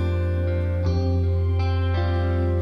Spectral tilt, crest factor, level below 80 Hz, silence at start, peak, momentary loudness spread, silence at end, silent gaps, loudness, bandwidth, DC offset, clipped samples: -9 dB/octave; 10 dB; -38 dBFS; 0 s; -12 dBFS; 1 LU; 0 s; none; -23 LUFS; 6 kHz; under 0.1%; under 0.1%